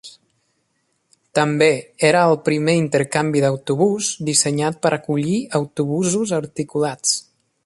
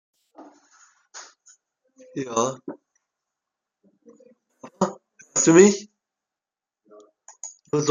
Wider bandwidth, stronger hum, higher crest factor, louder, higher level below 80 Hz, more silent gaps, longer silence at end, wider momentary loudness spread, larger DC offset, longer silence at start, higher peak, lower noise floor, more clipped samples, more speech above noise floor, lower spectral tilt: first, 11.5 kHz vs 9.6 kHz; neither; second, 18 dB vs 24 dB; about the same, -19 LUFS vs -20 LUFS; first, -62 dBFS vs -68 dBFS; neither; first, 0.45 s vs 0 s; second, 7 LU vs 28 LU; neither; second, 0.05 s vs 1.15 s; about the same, -2 dBFS vs -2 dBFS; second, -68 dBFS vs -90 dBFS; neither; second, 50 dB vs 72 dB; about the same, -4.5 dB/octave vs -4.5 dB/octave